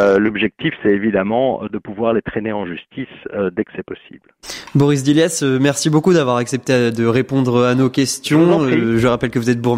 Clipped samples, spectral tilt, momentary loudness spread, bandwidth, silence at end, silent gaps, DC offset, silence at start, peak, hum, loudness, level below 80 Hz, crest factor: under 0.1%; -5.5 dB/octave; 14 LU; 16 kHz; 0 s; none; under 0.1%; 0 s; -2 dBFS; none; -16 LUFS; -48 dBFS; 14 dB